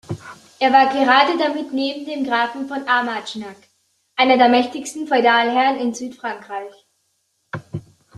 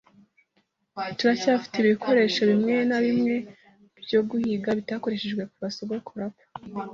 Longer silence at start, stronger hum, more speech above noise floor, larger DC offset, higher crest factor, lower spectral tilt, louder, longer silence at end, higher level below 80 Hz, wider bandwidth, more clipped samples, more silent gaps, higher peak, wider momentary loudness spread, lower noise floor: second, 0.1 s vs 0.95 s; neither; first, 50 dB vs 46 dB; neither; about the same, 18 dB vs 16 dB; second, -4 dB/octave vs -5.5 dB/octave; first, -17 LUFS vs -25 LUFS; first, 0.35 s vs 0 s; about the same, -66 dBFS vs -66 dBFS; first, 12.5 kHz vs 7.4 kHz; neither; neither; first, -2 dBFS vs -10 dBFS; first, 19 LU vs 15 LU; about the same, -68 dBFS vs -71 dBFS